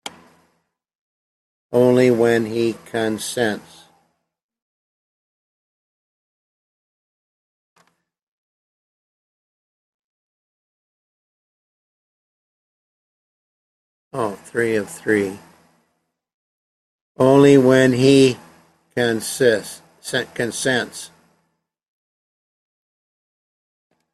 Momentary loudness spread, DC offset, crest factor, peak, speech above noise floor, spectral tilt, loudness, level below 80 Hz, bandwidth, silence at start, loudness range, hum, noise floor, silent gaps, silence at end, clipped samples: 19 LU; under 0.1%; 22 dB; -2 dBFS; 55 dB; -5 dB/octave; -18 LUFS; -62 dBFS; 14 kHz; 0.05 s; 13 LU; none; -72 dBFS; 0.95-1.70 s, 4.43-4.49 s, 4.62-7.76 s, 8.22-14.11 s, 16.34-17.15 s; 3.1 s; under 0.1%